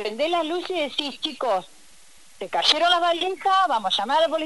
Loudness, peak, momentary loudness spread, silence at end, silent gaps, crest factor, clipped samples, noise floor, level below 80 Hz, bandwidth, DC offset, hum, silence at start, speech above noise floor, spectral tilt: -22 LUFS; -6 dBFS; 9 LU; 0 s; none; 18 dB; under 0.1%; -53 dBFS; -66 dBFS; 11.5 kHz; 0.4%; none; 0 s; 30 dB; -1.5 dB/octave